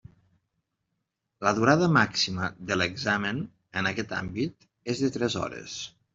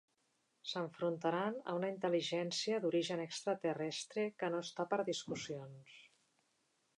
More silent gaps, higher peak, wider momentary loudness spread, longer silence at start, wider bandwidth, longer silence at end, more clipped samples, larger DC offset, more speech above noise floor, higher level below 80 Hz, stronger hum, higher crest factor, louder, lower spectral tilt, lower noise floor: neither; first, -6 dBFS vs -22 dBFS; first, 13 LU vs 9 LU; first, 1.4 s vs 0.65 s; second, 7.8 kHz vs 11 kHz; second, 0.25 s vs 0.9 s; neither; neither; first, 54 dB vs 41 dB; first, -62 dBFS vs -86 dBFS; neither; about the same, 22 dB vs 18 dB; first, -27 LUFS vs -39 LUFS; about the same, -4.5 dB/octave vs -4.5 dB/octave; about the same, -81 dBFS vs -80 dBFS